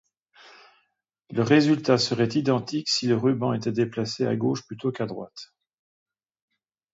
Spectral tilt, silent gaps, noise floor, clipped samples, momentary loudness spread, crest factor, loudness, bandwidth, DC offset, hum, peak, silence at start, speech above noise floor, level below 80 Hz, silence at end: -5.5 dB/octave; none; -74 dBFS; under 0.1%; 12 LU; 20 dB; -24 LUFS; 8 kHz; under 0.1%; none; -6 dBFS; 1.3 s; 50 dB; -68 dBFS; 1.5 s